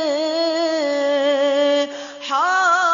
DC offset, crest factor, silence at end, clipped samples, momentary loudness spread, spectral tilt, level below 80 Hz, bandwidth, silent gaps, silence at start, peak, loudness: under 0.1%; 12 dB; 0 s; under 0.1%; 6 LU; -1 dB/octave; -72 dBFS; 7.6 kHz; none; 0 s; -6 dBFS; -18 LUFS